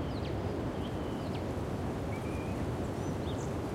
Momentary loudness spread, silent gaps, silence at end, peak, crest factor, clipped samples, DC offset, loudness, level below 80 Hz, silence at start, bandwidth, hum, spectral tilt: 1 LU; none; 0 s; -24 dBFS; 12 dB; under 0.1%; under 0.1%; -36 LUFS; -48 dBFS; 0 s; 16 kHz; none; -7 dB/octave